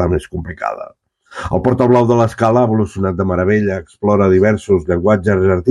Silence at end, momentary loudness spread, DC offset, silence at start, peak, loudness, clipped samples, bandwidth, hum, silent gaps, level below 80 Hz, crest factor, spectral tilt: 0 s; 11 LU; under 0.1%; 0 s; 0 dBFS; -14 LUFS; under 0.1%; 11 kHz; none; none; -38 dBFS; 14 dB; -8.5 dB/octave